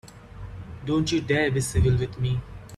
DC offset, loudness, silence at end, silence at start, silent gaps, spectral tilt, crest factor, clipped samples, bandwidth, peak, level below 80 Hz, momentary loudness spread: under 0.1%; -25 LUFS; 0 s; 0.05 s; none; -5.5 dB/octave; 16 dB; under 0.1%; 13 kHz; -10 dBFS; -38 dBFS; 18 LU